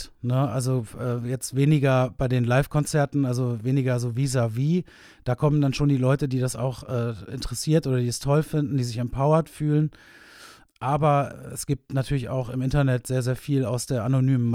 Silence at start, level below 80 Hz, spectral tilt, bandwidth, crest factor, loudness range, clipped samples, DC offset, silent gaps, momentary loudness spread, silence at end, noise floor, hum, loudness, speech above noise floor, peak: 0 s; -46 dBFS; -6.5 dB/octave; 15.5 kHz; 18 dB; 2 LU; under 0.1%; under 0.1%; none; 8 LU; 0 s; -49 dBFS; none; -24 LUFS; 26 dB; -6 dBFS